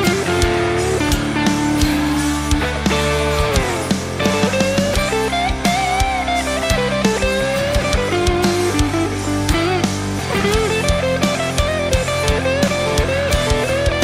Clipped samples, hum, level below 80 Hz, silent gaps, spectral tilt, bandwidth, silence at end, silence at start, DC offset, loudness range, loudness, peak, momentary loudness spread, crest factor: under 0.1%; none; -26 dBFS; none; -4.5 dB/octave; 16 kHz; 0 s; 0 s; under 0.1%; 0 LU; -17 LUFS; -2 dBFS; 2 LU; 14 dB